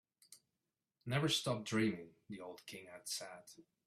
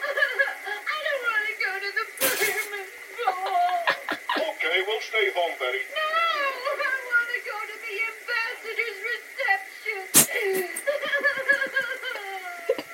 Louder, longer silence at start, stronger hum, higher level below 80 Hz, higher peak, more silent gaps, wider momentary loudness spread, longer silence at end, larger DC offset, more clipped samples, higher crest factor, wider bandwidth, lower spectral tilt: second, -39 LUFS vs -25 LUFS; first, 0.3 s vs 0 s; neither; about the same, -76 dBFS vs -72 dBFS; second, -22 dBFS vs -2 dBFS; neither; first, 18 LU vs 8 LU; first, 0.25 s vs 0 s; neither; neither; second, 20 dB vs 26 dB; about the same, 15.5 kHz vs 16.5 kHz; first, -4 dB/octave vs -0.5 dB/octave